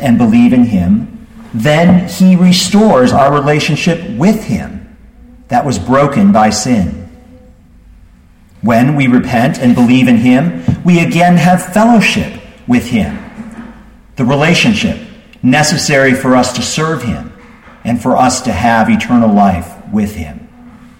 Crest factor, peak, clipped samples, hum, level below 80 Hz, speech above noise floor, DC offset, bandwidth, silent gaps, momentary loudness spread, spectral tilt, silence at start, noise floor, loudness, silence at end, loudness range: 10 dB; 0 dBFS; under 0.1%; none; -36 dBFS; 32 dB; under 0.1%; 16.5 kHz; none; 13 LU; -5.5 dB/octave; 0 s; -41 dBFS; -10 LUFS; 0.3 s; 4 LU